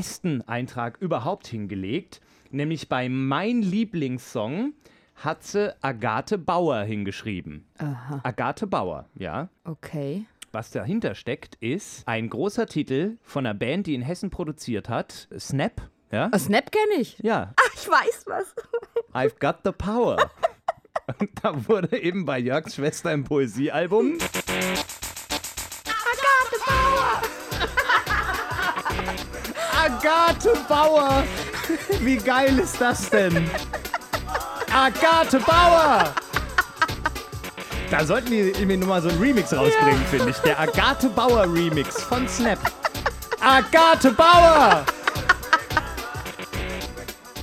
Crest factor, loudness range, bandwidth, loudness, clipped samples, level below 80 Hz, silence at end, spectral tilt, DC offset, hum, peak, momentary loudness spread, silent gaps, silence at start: 22 dB; 11 LU; 16.5 kHz; -22 LUFS; under 0.1%; -40 dBFS; 0 s; -4.5 dB/octave; under 0.1%; none; -2 dBFS; 14 LU; none; 0 s